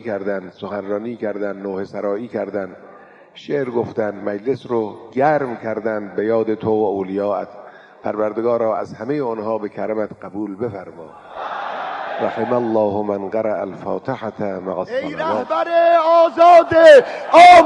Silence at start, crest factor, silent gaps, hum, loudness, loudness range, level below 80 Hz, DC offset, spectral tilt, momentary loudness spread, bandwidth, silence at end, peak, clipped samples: 0.05 s; 16 dB; none; none; -18 LUFS; 11 LU; -60 dBFS; under 0.1%; -5.5 dB/octave; 17 LU; 11 kHz; 0 s; 0 dBFS; under 0.1%